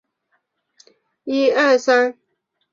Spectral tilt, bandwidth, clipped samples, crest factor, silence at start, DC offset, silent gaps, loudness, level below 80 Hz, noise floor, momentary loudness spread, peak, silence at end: -2.5 dB/octave; 7.4 kHz; under 0.1%; 18 dB; 1.25 s; under 0.1%; none; -17 LUFS; -72 dBFS; -72 dBFS; 10 LU; -2 dBFS; 0.6 s